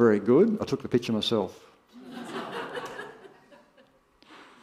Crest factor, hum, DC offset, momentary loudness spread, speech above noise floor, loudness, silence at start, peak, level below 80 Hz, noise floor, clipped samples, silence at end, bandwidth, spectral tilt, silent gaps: 20 dB; none; under 0.1%; 20 LU; 37 dB; -27 LUFS; 0 s; -8 dBFS; -68 dBFS; -61 dBFS; under 0.1%; 0.25 s; 14 kHz; -6 dB/octave; none